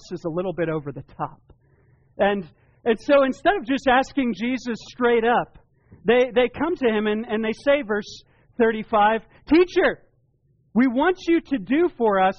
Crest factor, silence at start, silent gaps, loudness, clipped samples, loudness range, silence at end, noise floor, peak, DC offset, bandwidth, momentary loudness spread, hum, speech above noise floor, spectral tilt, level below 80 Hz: 14 dB; 0.05 s; none; -22 LUFS; under 0.1%; 2 LU; 0.05 s; -63 dBFS; -8 dBFS; under 0.1%; 7.2 kHz; 11 LU; none; 42 dB; -3.5 dB/octave; -50 dBFS